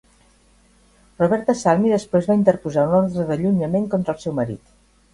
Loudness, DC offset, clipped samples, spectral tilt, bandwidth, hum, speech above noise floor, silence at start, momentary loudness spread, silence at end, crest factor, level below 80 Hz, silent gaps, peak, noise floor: -20 LUFS; under 0.1%; under 0.1%; -7.5 dB/octave; 11.5 kHz; none; 37 dB; 1.2 s; 7 LU; 0.55 s; 18 dB; -52 dBFS; none; -2 dBFS; -55 dBFS